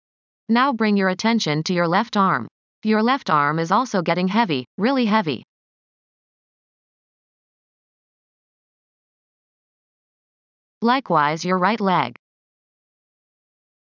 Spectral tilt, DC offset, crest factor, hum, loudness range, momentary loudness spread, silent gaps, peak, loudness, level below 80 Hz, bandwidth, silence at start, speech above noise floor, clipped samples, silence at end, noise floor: -5.5 dB/octave; under 0.1%; 20 dB; none; 7 LU; 5 LU; 2.51-2.82 s, 4.67-4.78 s, 5.44-10.81 s; -4 dBFS; -20 LUFS; -76 dBFS; 7.4 kHz; 0.5 s; over 71 dB; under 0.1%; 1.7 s; under -90 dBFS